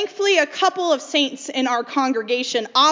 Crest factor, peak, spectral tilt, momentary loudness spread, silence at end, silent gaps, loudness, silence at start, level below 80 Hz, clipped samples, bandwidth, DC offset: 16 dB; -2 dBFS; -1 dB/octave; 5 LU; 0 s; none; -20 LUFS; 0 s; -82 dBFS; under 0.1%; 7.6 kHz; under 0.1%